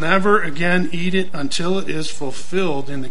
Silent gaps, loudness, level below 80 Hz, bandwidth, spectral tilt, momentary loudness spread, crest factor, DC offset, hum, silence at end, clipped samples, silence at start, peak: none; -21 LUFS; -50 dBFS; 11 kHz; -5 dB/octave; 10 LU; 20 dB; 10%; none; 0 s; under 0.1%; 0 s; 0 dBFS